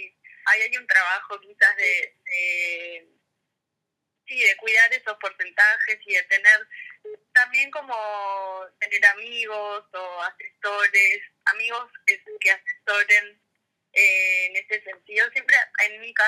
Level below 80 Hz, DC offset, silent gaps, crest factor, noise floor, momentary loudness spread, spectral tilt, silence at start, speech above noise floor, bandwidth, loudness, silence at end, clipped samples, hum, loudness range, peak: under -90 dBFS; under 0.1%; none; 20 dB; -82 dBFS; 15 LU; 2 dB/octave; 0 s; 59 dB; 17 kHz; -20 LUFS; 0 s; under 0.1%; none; 4 LU; -4 dBFS